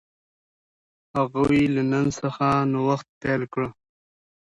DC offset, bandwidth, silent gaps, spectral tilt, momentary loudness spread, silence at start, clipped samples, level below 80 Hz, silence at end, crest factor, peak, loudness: under 0.1%; 10.5 kHz; 3.09-3.21 s; -7 dB/octave; 9 LU; 1.15 s; under 0.1%; -52 dBFS; 0.85 s; 16 dB; -8 dBFS; -24 LUFS